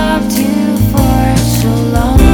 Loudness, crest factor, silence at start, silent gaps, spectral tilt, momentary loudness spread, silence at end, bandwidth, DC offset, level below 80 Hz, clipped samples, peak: -11 LUFS; 10 dB; 0 s; none; -6 dB/octave; 2 LU; 0 s; 20 kHz; under 0.1%; -16 dBFS; 2%; 0 dBFS